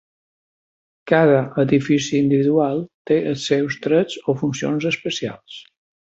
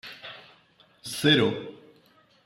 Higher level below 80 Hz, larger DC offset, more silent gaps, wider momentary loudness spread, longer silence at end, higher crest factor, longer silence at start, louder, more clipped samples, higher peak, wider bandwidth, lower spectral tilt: first, -60 dBFS vs -66 dBFS; neither; first, 2.94-3.05 s vs none; second, 10 LU vs 23 LU; second, 0.5 s vs 0.75 s; about the same, 18 dB vs 22 dB; first, 1.05 s vs 0.05 s; first, -19 LUFS vs -24 LUFS; neither; first, -2 dBFS vs -8 dBFS; second, 8 kHz vs 16 kHz; first, -6 dB/octave vs -4.5 dB/octave